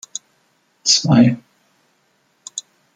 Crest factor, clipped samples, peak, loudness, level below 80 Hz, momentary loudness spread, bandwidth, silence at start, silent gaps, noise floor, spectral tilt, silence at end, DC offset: 18 dB; under 0.1%; -2 dBFS; -14 LUFS; -56 dBFS; 20 LU; 9.6 kHz; 0.85 s; none; -62 dBFS; -4 dB/octave; 0.35 s; under 0.1%